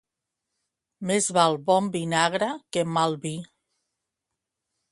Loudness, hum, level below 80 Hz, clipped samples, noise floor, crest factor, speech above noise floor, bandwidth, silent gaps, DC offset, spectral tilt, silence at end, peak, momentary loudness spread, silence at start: -24 LUFS; none; -70 dBFS; under 0.1%; -85 dBFS; 22 dB; 61 dB; 11.5 kHz; none; under 0.1%; -4 dB/octave; 1.45 s; -6 dBFS; 12 LU; 1 s